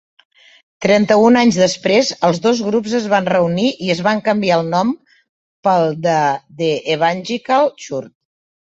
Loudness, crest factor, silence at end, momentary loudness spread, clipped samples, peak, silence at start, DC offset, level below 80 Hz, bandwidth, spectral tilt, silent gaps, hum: -15 LUFS; 14 dB; 0.65 s; 10 LU; under 0.1%; -2 dBFS; 0.8 s; under 0.1%; -58 dBFS; 8.2 kHz; -5 dB/octave; 5.29-5.63 s; none